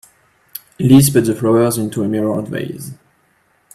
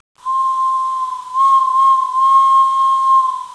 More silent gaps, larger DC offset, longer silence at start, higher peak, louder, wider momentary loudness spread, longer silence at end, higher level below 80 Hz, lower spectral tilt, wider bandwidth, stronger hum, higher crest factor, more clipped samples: neither; neither; first, 0.8 s vs 0.25 s; first, 0 dBFS vs -4 dBFS; about the same, -15 LUFS vs -13 LUFS; first, 23 LU vs 9 LU; first, 0.8 s vs 0 s; first, -48 dBFS vs -66 dBFS; first, -6 dB/octave vs 1 dB/octave; first, 16 kHz vs 11 kHz; neither; first, 16 dB vs 10 dB; neither